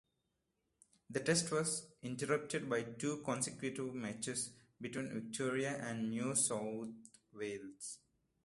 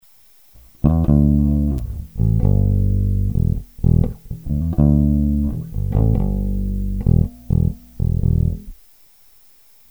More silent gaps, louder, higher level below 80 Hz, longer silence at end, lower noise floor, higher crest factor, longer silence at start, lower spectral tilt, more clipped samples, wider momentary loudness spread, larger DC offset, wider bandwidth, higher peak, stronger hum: neither; second, -39 LUFS vs -19 LUFS; second, -76 dBFS vs -22 dBFS; second, 0.5 s vs 1.15 s; first, -85 dBFS vs -52 dBFS; first, 20 dB vs 14 dB; first, 1.1 s vs 0.85 s; second, -3.5 dB/octave vs -11 dB/octave; neither; first, 14 LU vs 9 LU; second, under 0.1% vs 0.3%; second, 12 kHz vs over 20 kHz; second, -20 dBFS vs -2 dBFS; neither